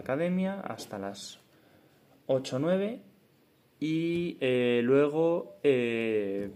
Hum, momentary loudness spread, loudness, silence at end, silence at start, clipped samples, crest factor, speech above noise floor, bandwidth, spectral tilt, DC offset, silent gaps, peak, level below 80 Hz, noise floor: none; 14 LU; -29 LUFS; 0 s; 0 s; under 0.1%; 18 dB; 36 dB; 15 kHz; -6.5 dB/octave; under 0.1%; none; -12 dBFS; -74 dBFS; -65 dBFS